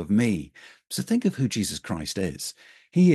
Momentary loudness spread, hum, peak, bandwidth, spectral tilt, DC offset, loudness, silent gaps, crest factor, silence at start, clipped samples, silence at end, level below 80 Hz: 11 LU; none; -8 dBFS; 12.5 kHz; -5.5 dB/octave; under 0.1%; -27 LUFS; none; 16 dB; 0 s; under 0.1%; 0 s; -54 dBFS